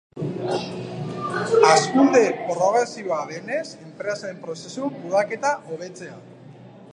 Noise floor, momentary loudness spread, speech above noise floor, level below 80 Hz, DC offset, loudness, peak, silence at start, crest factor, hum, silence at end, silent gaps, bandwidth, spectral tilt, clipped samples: -44 dBFS; 18 LU; 22 dB; -70 dBFS; under 0.1%; -22 LUFS; -2 dBFS; 0.15 s; 22 dB; none; 0 s; none; 10.5 kHz; -4.5 dB/octave; under 0.1%